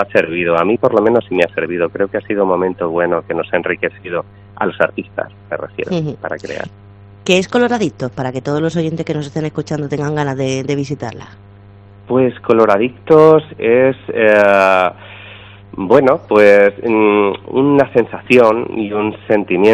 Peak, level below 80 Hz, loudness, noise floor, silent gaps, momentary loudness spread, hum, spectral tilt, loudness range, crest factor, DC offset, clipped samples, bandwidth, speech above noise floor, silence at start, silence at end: 0 dBFS; -50 dBFS; -14 LUFS; -40 dBFS; none; 14 LU; none; -6.5 dB/octave; 8 LU; 14 dB; under 0.1%; 0.4%; 9 kHz; 26 dB; 0 s; 0 s